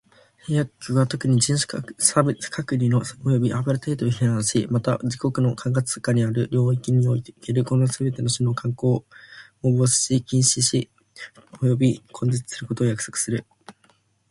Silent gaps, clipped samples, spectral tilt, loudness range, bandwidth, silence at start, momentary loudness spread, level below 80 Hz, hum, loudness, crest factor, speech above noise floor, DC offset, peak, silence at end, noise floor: none; under 0.1%; -5 dB/octave; 2 LU; 11.5 kHz; 0.45 s; 8 LU; -56 dBFS; none; -22 LUFS; 20 dB; 40 dB; under 0.1%; -2 dBFS; 0.6 s; -62 dBFS